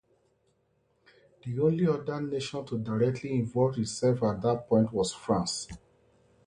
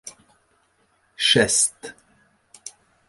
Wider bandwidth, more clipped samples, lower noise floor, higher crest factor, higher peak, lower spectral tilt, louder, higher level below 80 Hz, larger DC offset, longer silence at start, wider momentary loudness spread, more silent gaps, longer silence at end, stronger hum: about the same, 11 kHz vs 12 kHz; neither; first, -72 dBFS vs -65 dBFS; about the same, 18 dB vs 22 dB; second, -12 dBFS vs -4 dBFS; first, -6 dB/octave vs -1.5 dB/octave; second, -29 LUFS vs -18 LUFS; about the same, -60 dBFS vs -58 dBFS; neither; first, 1.45 s vs 0.05 s; second, 9 LU vs 25 LU; neither; first, 0.7 s vs 0.4 s; neither